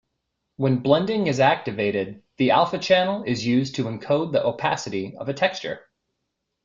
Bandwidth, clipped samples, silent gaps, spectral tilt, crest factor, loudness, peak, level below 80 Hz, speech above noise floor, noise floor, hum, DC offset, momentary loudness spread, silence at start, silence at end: 7.6 kHz; under 0.1%; none; -5.5 dB/octave; 20 dB; -22 LUFS; -4 dBFS; -60 dBFS; 57 dB; -79 dBFS; none; under 0.1%; 10 LU; 0.6 s; 0.85 s